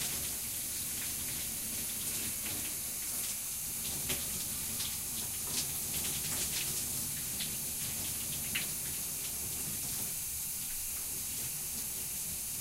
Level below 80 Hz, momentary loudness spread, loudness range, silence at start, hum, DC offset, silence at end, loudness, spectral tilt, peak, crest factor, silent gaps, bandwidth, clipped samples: -56 dBFS; 2 LU; 1 LU; 0 s; none; under 0.1%; 0 s; -34 LUFS; -1 dB/octave; -20 dBFS; 16 dB; none; 16 kHz; under 0.1%